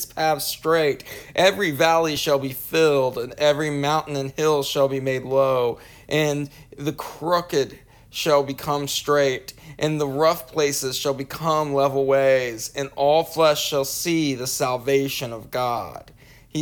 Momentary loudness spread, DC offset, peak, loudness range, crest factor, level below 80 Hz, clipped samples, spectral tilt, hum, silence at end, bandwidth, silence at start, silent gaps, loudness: 11 LU; under 0.1%; -4 dBFS; 3 LU; 18 dB; -54 dBFS; under 0.1%; -4 dB/octave; none; 0 s; over 20 kHz; 0 s; none; -22 LUFS